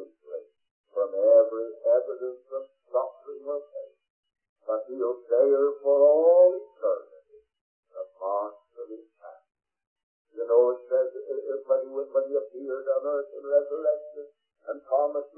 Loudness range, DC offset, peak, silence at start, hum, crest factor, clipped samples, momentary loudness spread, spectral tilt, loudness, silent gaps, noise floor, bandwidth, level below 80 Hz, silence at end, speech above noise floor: 11 LU; under 0.1%; -10 dBFS; 0 s; none; 18 dB; under 0.1%; 22 LU; -8.5 dB/octave; -25 LUFS; 0.71-0.84 s, 4.10-4.23 s, 4.49-4.56 s, 7.61-7.83 s, 9.87-9.96 s, 10.03-10.25 s; -56 dBFS; 1.7 kHz; under -90 dBFS; 0.1 s; 30 dB